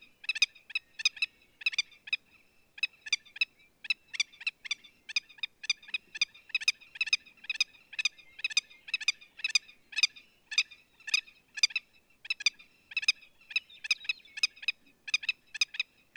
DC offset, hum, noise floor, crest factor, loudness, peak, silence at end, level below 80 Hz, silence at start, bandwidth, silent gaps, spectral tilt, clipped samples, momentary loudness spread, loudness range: under 0.1%; none; -64 dBFS; 26 dB; -32 LUFS; -10 dBFS; 0.35 s; -80 dBFS; 0.3 s; 17 kHz; none; 4.5 dB/octave; under 0.1%; 8 LU; 3 LU